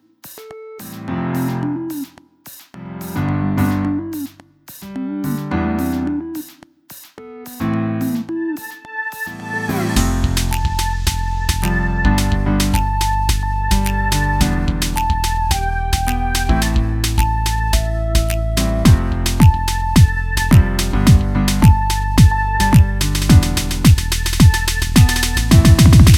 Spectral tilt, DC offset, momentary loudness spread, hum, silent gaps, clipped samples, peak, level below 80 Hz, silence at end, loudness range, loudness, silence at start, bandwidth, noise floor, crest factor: -5 dB/octave; under 0.1%; 15 LU; none; none; under 0.1%; 0 dBFS; -20 dBFS; 0 s; 10 LU; -16 LUFS; 0.25 s; 18.5 kHz; -42 dBFS; 16 dB